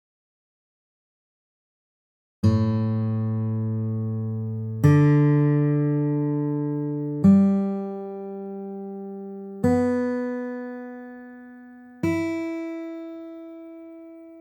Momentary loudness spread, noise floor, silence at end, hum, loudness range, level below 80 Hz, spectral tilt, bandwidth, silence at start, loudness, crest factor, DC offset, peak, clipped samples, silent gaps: 22 LU; -45 dBFS; 0 s; none; 10 LU; -60 dBFS; -9.5 dB/octave; 8.4 kHz; 2.45 s; -23 LUFS; 18 dB; under 0.1%; -6 dBFS; under 0.1%; none